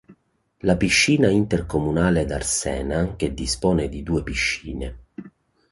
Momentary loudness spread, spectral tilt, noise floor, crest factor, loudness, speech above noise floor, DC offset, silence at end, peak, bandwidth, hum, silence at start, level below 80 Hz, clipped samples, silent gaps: 16 LU; -4.5 dB/octave; -63 dBFS; 18 dB; -21 LUFS; 41 dB; under 0.1%; 0.45 s; -4 dBFS; 11.5 kHz; none; 0.1 s; -36 dBFS; under 0.1%; none